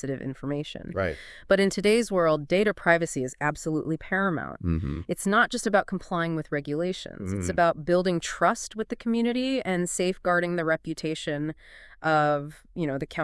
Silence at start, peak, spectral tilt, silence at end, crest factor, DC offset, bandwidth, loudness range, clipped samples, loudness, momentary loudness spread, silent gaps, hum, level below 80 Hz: 0.05 s; -6 dBFS; -5 dB/octave; 0 s; 20 dB; under 0.1%; 12 kHz; 3 LU; under 0.1%; -26 LUFS; 9 LU; none; none; -50 dBFS